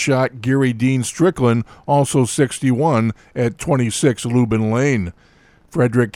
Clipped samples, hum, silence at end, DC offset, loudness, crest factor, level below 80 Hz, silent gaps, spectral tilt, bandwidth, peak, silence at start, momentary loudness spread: under 0.1%; none; 0.05 s; under 0.1%; -18 LUFS; 16 dB; -48 dBFS; none; -6 dB/octave; 14 kHz; -2 dBFS; 0 s; 6 LU